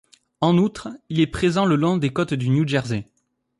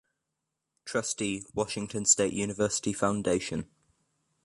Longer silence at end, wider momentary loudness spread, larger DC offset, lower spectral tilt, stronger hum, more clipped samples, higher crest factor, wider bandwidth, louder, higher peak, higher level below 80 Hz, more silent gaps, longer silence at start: second, 0.55 s vs 0.8 s; second, 9 LU vs 12 LU; neither; first, -7 dB/octave vs -3.5 dB/octave; neither; neither; second, 14 dB vs 22 dB; about the same, 11.5 kHz vs 11.5 kHz; first, -21 LUFS vs -29 LUFS; about the same, -6 dBFS vs -8 dBFS; first, -48 dBFS vs -60 dBFS; neither; second, 0.4 s vs 0.85 s